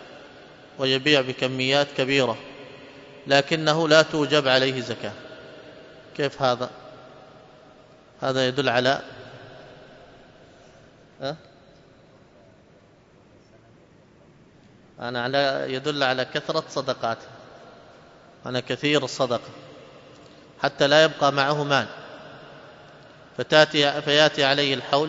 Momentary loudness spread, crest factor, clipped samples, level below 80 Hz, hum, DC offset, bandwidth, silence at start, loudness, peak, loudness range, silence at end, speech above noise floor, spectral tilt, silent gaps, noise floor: 25 LU; 24 dB; under 0.1%; -66 dBFS; none; under 0.1%; 8 kHz; 0 s; -22 LUFS; -2 dBFS; 20 LU; 0 s; 32 dB; -4 dB/octave; none; -54 dBFS